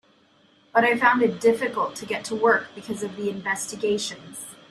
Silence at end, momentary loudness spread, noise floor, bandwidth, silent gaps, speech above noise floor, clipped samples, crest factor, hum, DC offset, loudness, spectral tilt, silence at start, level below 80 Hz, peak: 0.15 s; 13 LU; -59 dBFS; 13.5 kHz; none; 36 dB; under 0.1%; 20 dB; none; under 0.1%; -23 LUFS; -3.5 dB/octave; 0.75 s; -68 dBFS; -4 dBFS